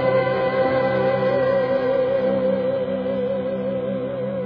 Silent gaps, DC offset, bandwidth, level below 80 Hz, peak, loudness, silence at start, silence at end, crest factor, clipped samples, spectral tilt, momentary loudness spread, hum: none; under 0.1%; 5.2 kHz; -54 dBFS; -8 dBFS; -21 LUFS; 0 s; 0 s; 14 dB; under 0.1%; -9 dB/octave; 5 LU; none